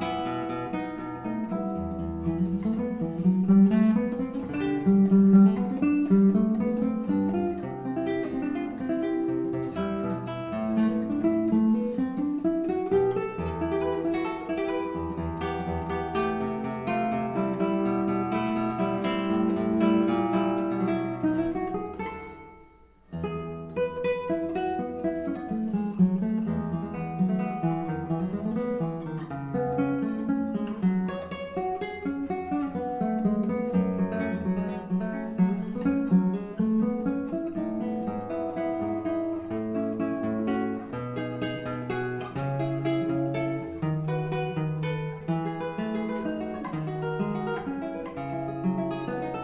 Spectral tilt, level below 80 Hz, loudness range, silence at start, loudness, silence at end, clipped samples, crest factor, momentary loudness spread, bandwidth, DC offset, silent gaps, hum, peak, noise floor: -8 dB/octave; -52 dBFS; 8 LU; 0 s; -28 LUFS; 0 s; under 0.1%; 18 dB; 9 LU; 4 kHz; under 0.1%; none; none; -8 dBFS; -55 dBFS